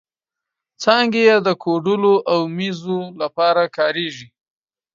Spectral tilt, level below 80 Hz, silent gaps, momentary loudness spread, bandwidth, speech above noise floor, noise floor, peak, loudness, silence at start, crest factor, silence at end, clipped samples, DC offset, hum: -5.5 dB/octave; -70 dBFS; none; 11 LU; 7.4 kHz; 68 dB; -86 dBFS; 0 dBFS; -18 LUFS; 0.8 s; 18 dB; 0.7 s; under 0.1%; under 0.1%; none